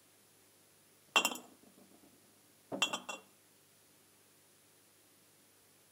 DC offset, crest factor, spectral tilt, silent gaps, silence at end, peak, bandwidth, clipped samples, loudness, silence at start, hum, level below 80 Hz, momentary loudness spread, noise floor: under 0.1%; 32 dB; -0.5 dB/octave; none; 2.7 s; -12 dBFS; 16 kHz; under 0.1%; -36 LUFS; 1.15 s; 50 Hz at -80 dBFS; under -90 dBFS; 29 LU; -66 dBFS